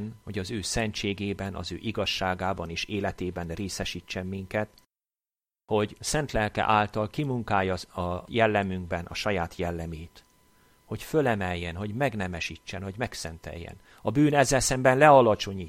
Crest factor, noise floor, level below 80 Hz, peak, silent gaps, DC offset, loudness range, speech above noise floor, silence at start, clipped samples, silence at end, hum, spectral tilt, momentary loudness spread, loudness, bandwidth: 22 dB; under -90 dBFS; -48 dBFS; -6 dBFS; none; under 0.1%; 5 LU; over 63 dB; 0 s; under 0.1%; 0 s; none; -4.5 dB/octave; 14 LU; -27 LUFS; 16 kHz